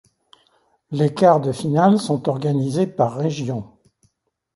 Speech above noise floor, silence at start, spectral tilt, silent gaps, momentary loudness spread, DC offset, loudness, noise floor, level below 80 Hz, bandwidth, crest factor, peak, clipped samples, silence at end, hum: 49 dB; 0.9 s; -7.5 dB/octave; none; 11 LU; under 0.1%; -19 LUFS; -68 dBFS; -60 dBFS; 11.5 kHz; 18 dB; -2 dBFS; under 0.1%; 0.9 s; none